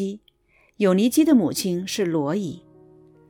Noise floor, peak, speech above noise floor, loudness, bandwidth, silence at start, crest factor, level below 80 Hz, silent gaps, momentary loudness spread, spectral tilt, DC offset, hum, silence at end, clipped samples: -61 dBFS; -6 dBFS; 41 dB; -21 LUFS; 19 kHz; 0 s; 16 dB; -62 dBFS; none; 15 LU; -5.5 dB/octave; under 0.1%; none; 0.7 s; under 0.1%